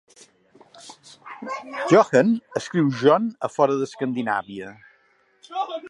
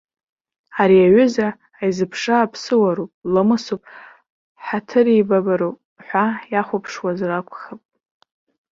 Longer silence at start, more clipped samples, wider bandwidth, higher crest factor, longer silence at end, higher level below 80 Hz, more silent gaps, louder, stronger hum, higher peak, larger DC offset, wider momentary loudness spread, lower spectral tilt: about the same, 0.85 s vs 0.75 s; neither; first, 11.5 kHz vs 7.6 kHz; about the same, 20 dB vs 16 dB; second, 0 s vs 0.95 s; second, -72 dBFS vs -60 dBFS; second, none vs 3.14-3.22 s, 4.30-4.55 s, 5.85-5.96 s; second, -21 LUFS vs -18 LUFS; neither; about the same, -2 dBFS vs -2 dBFS; neither; first, 20 LU vs 15 LU; about the same, -6 dB/octave vs -6.5 dB/octave